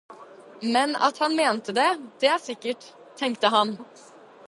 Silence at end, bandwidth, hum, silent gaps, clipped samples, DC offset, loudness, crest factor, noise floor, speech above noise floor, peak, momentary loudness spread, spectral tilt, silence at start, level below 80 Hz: 0.65 s; 11.5 kHz; none; none; under 0.1%; under 0.1%; -24 LUFS; 20 dB; -46 dBFS; 22 dB; -4 dBFS; 11 LU; -3 dB/octave; 0.1 s; -80 dBFS